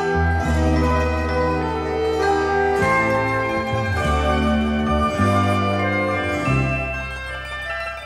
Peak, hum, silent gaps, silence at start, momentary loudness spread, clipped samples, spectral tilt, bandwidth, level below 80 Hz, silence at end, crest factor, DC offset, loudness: -6 dBFS; none; none; 0 s; 8 LU; under 0.1%; -6.5 dB/octave; 13 kHz; -30 dBFS; 0 s; 14 dB; under 0.1%; -20 LUFS